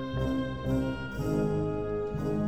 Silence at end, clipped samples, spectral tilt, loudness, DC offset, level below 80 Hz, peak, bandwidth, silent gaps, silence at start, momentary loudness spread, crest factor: 0 s; under 0.1%; -8 dB/octave; -31 LUFS; 0.4%; -42 dBFS; -18 dBFS; 15.5 kHz; none; 0 s; 4 LU; 12 dB